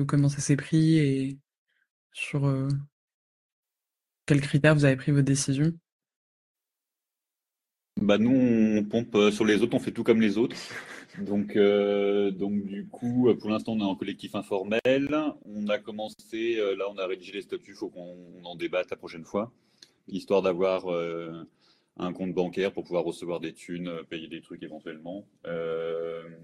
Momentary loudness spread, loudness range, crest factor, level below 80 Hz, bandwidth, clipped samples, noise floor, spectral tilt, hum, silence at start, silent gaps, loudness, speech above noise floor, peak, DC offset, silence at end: 17 LU; 8 LU; 20 dB; -64 dBFS; 12 kHz; under 0.1%; -89 dBFS; -6.5 dB/octave; none; 0 s; 1.58-1.66 s, 1.90-2.10 s, 2.92-3.08 s, 3.14-3.63 s, 5.92-6.00 s, 6.16-6.55 s; -27 LUFS; 62 dB; -6 dBFS; under 0.1%; 0 s